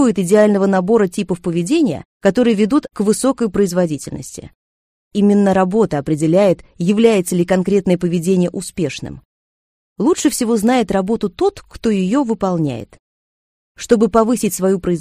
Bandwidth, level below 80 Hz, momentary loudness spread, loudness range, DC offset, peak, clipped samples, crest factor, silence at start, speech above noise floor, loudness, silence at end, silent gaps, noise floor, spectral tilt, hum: 15.5 kHz; -46 dBFS; 9 LU; 3 LU; under 0.1%; 0 dBFS; under 0.1%; 16 dB; 0 s; over 75 dB; -16 LUFS; 0 s; 2.05-2.20 s, 4.55-5.11 s, 9.25-9.96 s, 12.99-13.75 s; under -90 dBFS; -6 dB/octave; none